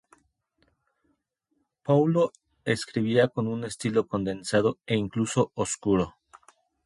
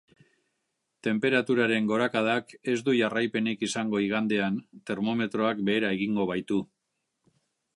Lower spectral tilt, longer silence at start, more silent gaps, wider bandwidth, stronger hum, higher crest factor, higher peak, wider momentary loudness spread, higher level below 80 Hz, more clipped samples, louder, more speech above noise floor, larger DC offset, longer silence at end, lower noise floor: about the same, -5.5 dB/octave vs -5.5 dB/octave; first, 1.85 s vs 1.05 s; neither; about the same, 11.5 kHz vs 11 kHz; neither; about the same, 18 dB vs 18 dB; about the same, -8 dBFS vs -10 dBFS; about the same, 7 LU vs 7 LU; first, -58 dBFS vs -70 dBFS; neither; about the same, -26 LUFS vs -27 LUFS; about the same, 51 dB vs 53 dB; neither; second, 0.75 s vs 1.1 s; second, -76 dBFS vs -80 dBFS